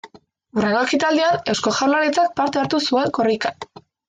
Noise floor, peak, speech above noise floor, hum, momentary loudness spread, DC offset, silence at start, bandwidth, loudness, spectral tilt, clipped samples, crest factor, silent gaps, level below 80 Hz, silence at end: -49 dBFS; -6 dBFS; 30 dB; none; 8 LU; under 0.1%; 0.05 s; 9.6 kHz; -19 LUFS; -4 dB/octave; under 0.1%; 14 dB; none; -60 dBFS; 0.45 s